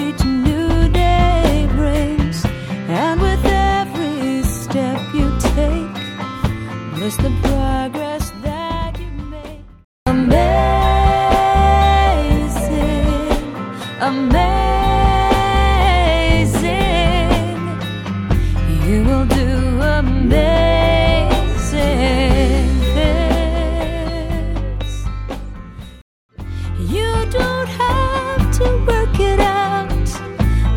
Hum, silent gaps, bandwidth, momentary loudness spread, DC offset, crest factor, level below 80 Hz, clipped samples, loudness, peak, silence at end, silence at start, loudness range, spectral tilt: none; 9.84-10.06 s, 26.01-26.29 s; 16 kHz; 11 LU; under 0.1%; 14 dB; -20 dBFS; under 0.1%; -17 LUFS; 0 dBFS; 0 s; 0 s; 7 LU; -6 dB/octave